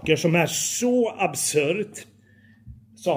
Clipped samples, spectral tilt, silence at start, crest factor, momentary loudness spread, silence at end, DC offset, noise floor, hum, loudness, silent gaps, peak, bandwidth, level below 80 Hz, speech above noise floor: under 0.1%; -4 dB/octave; 0 s; 20 dB; 10 LU; 0 s; under 0.1%; -54 dBFS; none; -22 LUFS; none; -4 dBFS; over 20 kHz; -58 dBFS; 32 dB